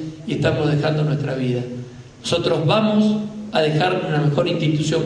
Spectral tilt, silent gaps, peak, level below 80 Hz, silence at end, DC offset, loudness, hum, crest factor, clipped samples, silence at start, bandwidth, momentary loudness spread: -6.5 dB/octave; none; -4 dBFS; -52 dBFS; 0 s; under 0.1%; -20 LUFS; none; 14 dB; under 0.1%; 0 s; 10.5 kHz; 9 LU